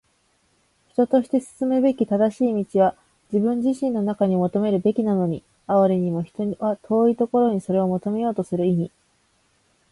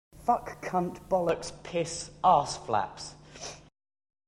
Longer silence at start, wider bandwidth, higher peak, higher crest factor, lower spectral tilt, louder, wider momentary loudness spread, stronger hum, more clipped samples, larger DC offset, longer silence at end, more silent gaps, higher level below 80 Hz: first, 1 s vs 0.15 s; second, 11.5 kHz vs 13.5 kHz; about the same, -8 dBFS vs -10 dBFS; second, 14 dB vs 22 dB; first, -9 dB/octave vs -4.5 dB/octave; first, -22 LUFS vs -29 LUFS; second, 6 LU vs 18 LU; neither; neither; neither; first, 1.05 s vs 0.7 s; neither; second, -62 dBFS vs -56 dBFS